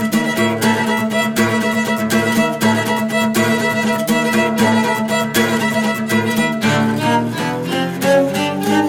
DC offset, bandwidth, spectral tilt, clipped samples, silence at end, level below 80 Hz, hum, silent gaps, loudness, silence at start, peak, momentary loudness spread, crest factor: under 0.1%; 18 kHz; -4.5 dB/octave; under 0.1%; 0 s; -54 dBFS; none; none; -16 LUFS; 0 s; -2 dBFS; 3 LU; 14 dB